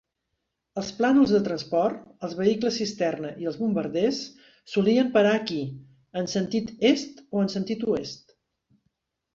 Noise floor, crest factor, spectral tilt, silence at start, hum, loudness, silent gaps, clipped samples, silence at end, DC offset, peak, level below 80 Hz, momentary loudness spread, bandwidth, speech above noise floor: -80 dBFS; 18 dB; -5.5 dB/octave; 0.75 s; none; -25 LUFS; none; under 0.1%; 1.2 s; under 0.1%; -8 dBFS; -62 dBFS; 15 LU; 7.6 kHz; 56 dB